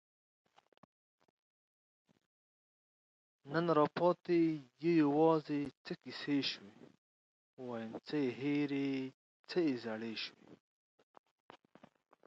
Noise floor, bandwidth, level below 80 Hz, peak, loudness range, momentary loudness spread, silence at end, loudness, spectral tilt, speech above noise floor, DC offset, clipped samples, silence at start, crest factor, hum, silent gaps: -66 dBFS; 7.6 kHz; -84 dBFS; -18 dBFS; 7 LU; 14 LU; 1.7 s; -36 LUFS; -7 dB/octave; 30 dB; under 0.1%; under 0.1%; 3.45 s; 20 dB; none; 5.77-5.85 s, 6.98-7.57 s, 9.14-9.44 s